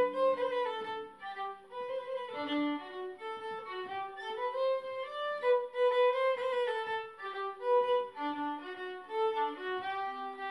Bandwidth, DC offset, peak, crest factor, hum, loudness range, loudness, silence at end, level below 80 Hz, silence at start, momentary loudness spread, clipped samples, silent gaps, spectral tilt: 10.5 kHz; under 0.1%; -18 dBFS; 16 dB; none; 7 LU; -34 LUFS; 0 s; -82 dBFS; 0 s; 12 LU; under 0.1%; none; -4.5 dB/octave